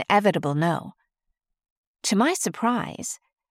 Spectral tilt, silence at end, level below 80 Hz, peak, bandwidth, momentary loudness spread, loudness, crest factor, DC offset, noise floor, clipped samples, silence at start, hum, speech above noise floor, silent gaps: -4.5 dB/octave; 0.35 s; -68 dBFS; -6 dBFS; 16 kHz; 13 LU; -24 LUFS; 20 dB; under 0.1%; -78 dBFS; under 0.1%; 0 s; none; 55 dB; 1.70-1.94 s